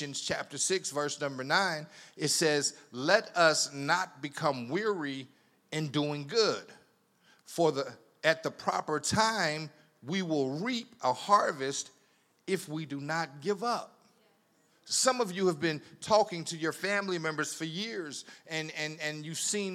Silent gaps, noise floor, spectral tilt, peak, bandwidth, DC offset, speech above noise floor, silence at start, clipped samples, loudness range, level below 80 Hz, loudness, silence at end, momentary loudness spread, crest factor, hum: none; -69 dBFS; -3 dB/octave; -8 dBFS; 16 kHz; under 0.1%; 37 dB; 0 s; under 0.1%; 5 LU; -76 dBFS; -31 LUFS; 0 s; 12 LU; 24 dB; none